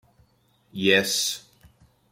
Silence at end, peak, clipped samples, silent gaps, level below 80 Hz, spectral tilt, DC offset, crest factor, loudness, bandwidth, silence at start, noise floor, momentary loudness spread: 0.7 s; -4 dBFS; under 0.1%; none; -66 dBFS; -2.5 dB/octave; under 0.1%; 24 dB; -22 LUFS; 16.5 kHz; 0.75 s; -64 dBFS; 17 LU